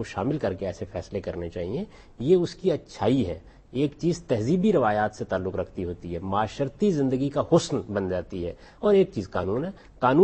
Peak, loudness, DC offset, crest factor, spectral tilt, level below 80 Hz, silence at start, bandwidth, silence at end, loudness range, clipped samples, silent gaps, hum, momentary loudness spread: -8 dBFS; -26 LUFS; under 0.1%; 18 dB; -7 dB/octave; -50 dBFS; 0 s; 8.4 kHz; 0 s; 2 LU; under 0.1%; none; none; 11 LU